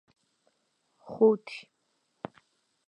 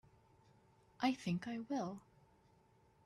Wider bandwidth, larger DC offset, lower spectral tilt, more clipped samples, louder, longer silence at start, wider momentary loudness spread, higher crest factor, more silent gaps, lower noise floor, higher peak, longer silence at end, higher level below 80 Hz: second, 8.4 kHz vs 12.5 kHz; neither; first, -7.5 dB/octave vs -6 dB/octave; neither; first, -26 LUFS vs -41 LUFS; about the same, 1.1 s vs 1 s; first, 21 LU vs 8 LU; about the same, 22 dB vs 22 dB; neither; first, -76 dBFS vs -71 dBFS; first, -10 dBFS vs -22 dBFS; first, 1.3 s vs 1.05 s; about the same, -80 dBFS vs -78 dBFS